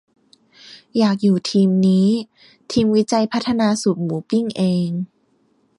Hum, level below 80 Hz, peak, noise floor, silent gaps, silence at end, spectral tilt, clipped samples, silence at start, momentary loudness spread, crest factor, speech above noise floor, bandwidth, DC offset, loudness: none; -56 dBFS; -6 dBFS; -61 dBFS; none; 0.75 s; -6.5 dB/octave; under 0.1%; 0.65 s; 9 LU; 14 dB; 44 dB; 11 kHz; under 0.1%; -18 LUFS